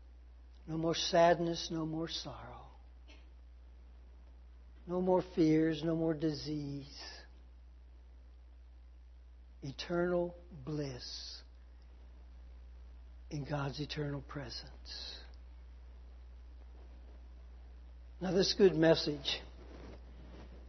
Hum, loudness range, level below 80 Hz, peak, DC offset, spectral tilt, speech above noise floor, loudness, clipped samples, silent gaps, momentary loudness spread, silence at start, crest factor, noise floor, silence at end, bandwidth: none; 14 LU; -54 dBFS; -14 dBFS; under 0.1%; -4.5 dB/octave; 21 dB; -35 LUFS; under 0.1%; none; 26 LU; 0 s; 22 dB; -56 dBFS; 0 s; 6.2 kHz